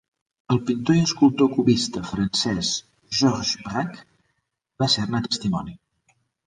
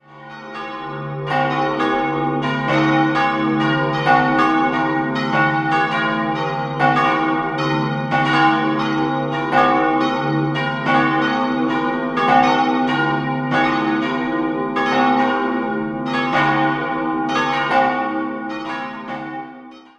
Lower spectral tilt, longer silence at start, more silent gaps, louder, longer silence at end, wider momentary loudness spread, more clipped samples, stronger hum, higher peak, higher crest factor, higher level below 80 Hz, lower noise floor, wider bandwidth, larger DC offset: second, -5 dB/octave vs -6.5 dB/octave; first, 0.5 s vs 0.1 s; neither; second, -22 LUFS vs -18 LUFS; first, 0.7 s vs 0.2 s; about the same, 10 LU vs 11 LU; neither; neither; second, -6 dBFS vs -2 dBFS; about the same, 18 dB vs 16 dB; about the same, -52 dBFS vs -54 dBFS; first, -75 dBFS vs -39 dBFS; about the same, 10 kHz vs 9.4 kHz; neither